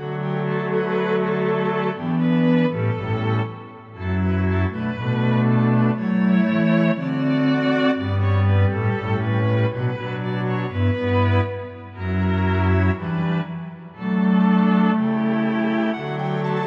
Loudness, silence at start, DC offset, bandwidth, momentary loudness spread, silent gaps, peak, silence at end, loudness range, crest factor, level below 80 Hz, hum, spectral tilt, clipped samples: -21 LUFS; 0 s; under 0.1%; 5.8 kHz; 8 LU; none; -8 dBFS; 0 s; 3 LU; 12 dB; -50 dBFS; none; -9.5 dB/octave; under 0.1%